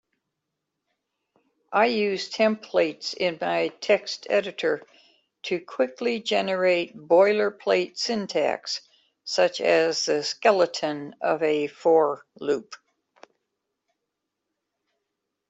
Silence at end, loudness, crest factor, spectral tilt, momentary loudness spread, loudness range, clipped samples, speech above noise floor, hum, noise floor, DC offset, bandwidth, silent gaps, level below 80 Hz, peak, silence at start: 2.75 s; -24 LUFS; 20 dB; -3.5 dB/octave; 9 LU; 4 LU; under 0.1%; 58 dB; none; -82 dBFS; under 0.1%; 8.2 kHz; none; -74 dBFS; -6 dBFS; 1.7 s